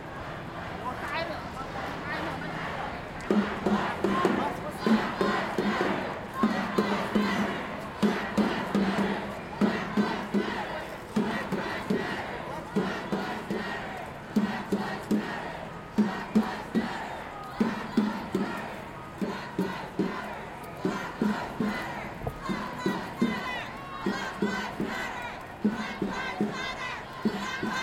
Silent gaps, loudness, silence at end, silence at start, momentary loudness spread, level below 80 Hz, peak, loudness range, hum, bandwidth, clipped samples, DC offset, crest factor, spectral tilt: none; -31 LUFS; 0 s; 0 s; 9 LU; -54 dBFS; -10 dBFS; 5 LU; none; 16 kHz; under 0.1%; under 0.1%; 20 dB; -6 dB/octave